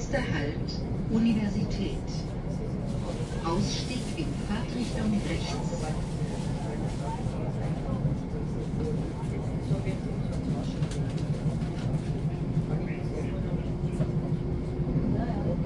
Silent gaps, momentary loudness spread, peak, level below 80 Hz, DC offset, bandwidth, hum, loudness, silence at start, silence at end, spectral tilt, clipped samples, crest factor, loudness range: none; 4 LU; -14 dBFS; -38 dBFS; under 0.1%; 11.5 kHz; none; -31 LUFS; 0 s; 0 s; -7 dB/octave; under 0.1%; 14 dB; 2 LU